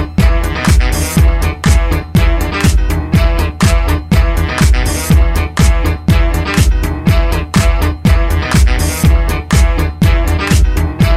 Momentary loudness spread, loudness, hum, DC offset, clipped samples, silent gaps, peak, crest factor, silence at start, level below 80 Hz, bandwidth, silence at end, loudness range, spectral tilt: 2 LU; -12 LUFS; none; under 0.1%; under 0.1%; none; 0 dBFS; 10 dB; 0 s; -12 dBFS; 15.5 kHz; 0 s; 0 LU; -5.5 dB/octave